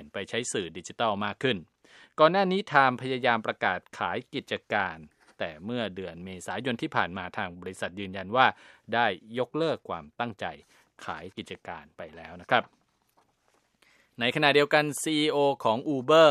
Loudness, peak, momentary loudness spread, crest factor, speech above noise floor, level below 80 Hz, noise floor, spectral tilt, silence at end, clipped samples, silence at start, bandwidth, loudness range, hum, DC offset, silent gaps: -27 LUFS; -4 dBFS; 17 LU; 24 dB; 42 dB; -68 dBFS; -70 dBFS; -4 dB/octave; 0 s; under 0.1%; 0 s; 14 kHz; 9 LU; none; under 0.1%; none